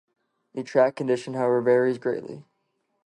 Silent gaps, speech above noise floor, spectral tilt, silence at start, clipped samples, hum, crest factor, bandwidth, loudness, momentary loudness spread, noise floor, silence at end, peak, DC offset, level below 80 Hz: none; 51 dB; -7 dB/octave; 0.55 s; under 0.1%; none; 18 dB; 11 kHz; -24 LUFS; 18 LU; -74 dBFS; 0.65 s; -8 dBFS; under 0.1%; -76 dBFS